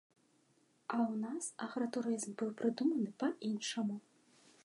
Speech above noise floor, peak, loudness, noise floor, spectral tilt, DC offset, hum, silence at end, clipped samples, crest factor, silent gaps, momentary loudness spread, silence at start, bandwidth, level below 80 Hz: 36 dB; -22 dBFS; -38 LUFS; -73 dBFS; -4.5 dB/octave; under 0.1%; none; 0.65 s; under 0.1%; 16 dB; none; 6 LU; 0.9 s; 11.5 kHz; under -90 dBFS